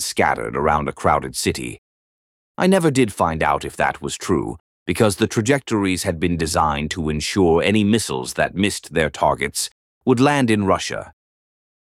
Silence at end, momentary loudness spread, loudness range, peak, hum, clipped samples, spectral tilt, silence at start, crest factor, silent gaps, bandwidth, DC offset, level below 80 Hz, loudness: 0.7 s; 9 LU; 2 LU; -4 dBFS; none; under 0.1%; -5 dB/octave; 0 s; 16 dB; 1.78-2.55 s, 4.60-4.86 s, 9.72-10.01 s; 16.5 kHz; under 0.1%; -42 dBFS; -19 LUFS